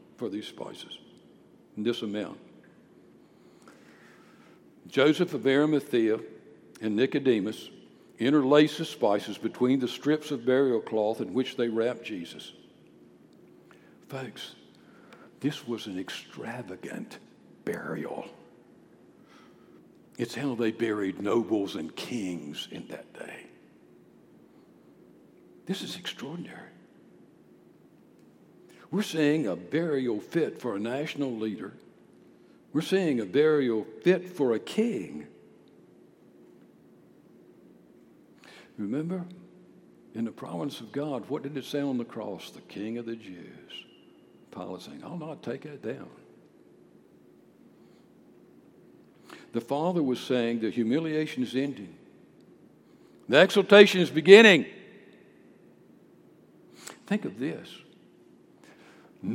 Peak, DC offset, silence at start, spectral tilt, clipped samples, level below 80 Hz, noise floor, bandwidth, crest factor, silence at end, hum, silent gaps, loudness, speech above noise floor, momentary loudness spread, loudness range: 0 dBFS; under 0.1%; 0.2 s; -5.5 dB/octave; under 0.1%; -80 dBFS; -57 dBFS; 16 kHz; 28 dB; 0 s; none; none; -27 LUFS; 30 dB; 20 LU; 19 LU